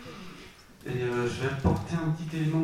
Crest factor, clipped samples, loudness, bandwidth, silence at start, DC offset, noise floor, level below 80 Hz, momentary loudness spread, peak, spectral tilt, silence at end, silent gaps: 18 dB; under 0.1%; -30 LUFS; 14.5 kHz; 0 s; 0.1%; -50 dBFS; -46 dBFS; 18 LU; -12 dBFS; -7 dB/octave; 0 s; none